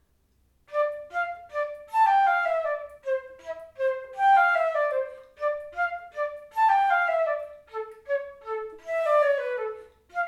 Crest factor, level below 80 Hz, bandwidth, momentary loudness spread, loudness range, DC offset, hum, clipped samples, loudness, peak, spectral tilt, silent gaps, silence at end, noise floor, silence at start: 16 dB; -68 dBFS; 12.5 kHz; 15 LU; 3 LU; under 0.1%; none; under 0.1%; -26 LUFS; -10 dBFS; -2 dB/octave; none; 0 s; -66 dBFS; 0.7 s